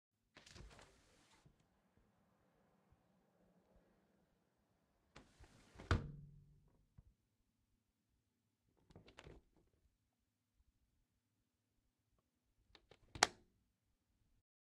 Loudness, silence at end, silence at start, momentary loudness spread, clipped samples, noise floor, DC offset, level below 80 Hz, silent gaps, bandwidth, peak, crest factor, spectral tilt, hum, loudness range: -41 LUFS; 1.35 s; 0.35 s; 27 LU; under 0.1%; -88 dBFS; under 0.1%; -64 dBFS; none; 11.5 kHz; -10 dBFS; 42 dB; -3 dB/octave; none; 23 LU